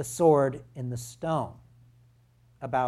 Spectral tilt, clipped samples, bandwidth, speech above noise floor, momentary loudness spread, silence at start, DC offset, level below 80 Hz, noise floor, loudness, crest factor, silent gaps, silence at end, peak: -6.5 dB/octave; under 0.1%; 14.5 kHz; 34 dB; 16 LU; 0 s; under 0.1%; -62 dBFS; -61 dBFS; -27 LUFS; 20 dB; none; 0 s; -10 dBFS